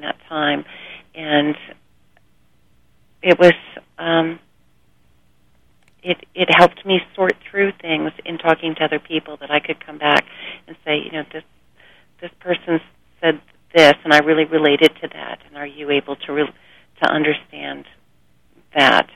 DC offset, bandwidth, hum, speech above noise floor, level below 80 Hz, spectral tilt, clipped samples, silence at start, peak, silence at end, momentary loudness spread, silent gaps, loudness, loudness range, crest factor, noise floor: 0.2%; 15.5 kHz; 60 Hz at -55 dBFS; 43 dB; -60 dBFS; -5 dB/octave; under 0.1%; 0 s; 0 dBFS; 0.15 s; 20 LU; none; -17 LUFS; 7 LU; 20 dB; -60 dBFS